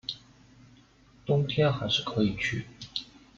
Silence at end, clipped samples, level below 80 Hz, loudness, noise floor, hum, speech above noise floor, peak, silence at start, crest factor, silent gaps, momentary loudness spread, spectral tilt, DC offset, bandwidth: 0.35 s; under 0.1%; -58 dBFS; -29 LUFS; -58 dBFS; none; 31 dB; -12 dBFS; 0.1 s; 18 dB; none; 13 LU; -6 dB/octave; under 0.1%; 7.6 kHz